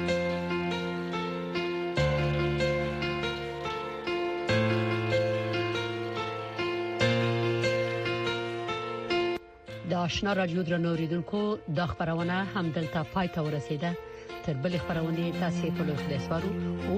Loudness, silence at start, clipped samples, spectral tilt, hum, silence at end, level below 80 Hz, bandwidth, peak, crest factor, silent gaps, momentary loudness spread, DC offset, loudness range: -30 LUFS; 0 s; under 0.1%; -6.5 dB/octave; none; 0 s; -50 dBFS; 14.5 kHz; -12 dBFS; 18 dB; none; 6 LU; under 0.1%; 2 LU